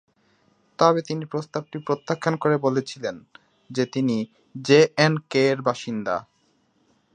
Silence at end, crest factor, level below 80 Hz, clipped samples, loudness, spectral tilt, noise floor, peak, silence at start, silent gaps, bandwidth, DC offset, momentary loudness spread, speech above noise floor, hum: 0.95 s; 22 dB; -68 dBFS; under 0.1%; -23 LUFS; -5.5 dB/octave; -65 dBFS; -2 dBFS; 0.8 s; none; 9.6 kHz; under 0.1%; 13 LU; 43 dB; none